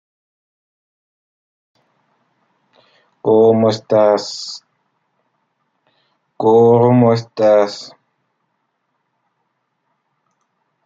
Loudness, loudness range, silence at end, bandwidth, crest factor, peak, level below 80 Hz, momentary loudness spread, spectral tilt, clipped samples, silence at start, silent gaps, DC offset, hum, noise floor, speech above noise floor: -13 LUFS; 6 LU; 3 s; 7.8 kHz; 16 dB; -2 dBFS; -66 dBFS; 18 LU; -7 dB/octave; under 0.1%; 3.25 s; none; under 0.1%; none; -70 dBFS; 57 dB